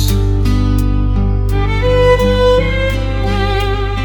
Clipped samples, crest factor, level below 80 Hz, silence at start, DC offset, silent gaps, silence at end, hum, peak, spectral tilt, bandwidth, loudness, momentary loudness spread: under 0.1%; 12 dB; -16 dBFS; 0 s; under 0.1%; none; 0 s; none; 0 dBFS; -6.5 dB/octave; 19 kHz; -14 LUFS; 6 LU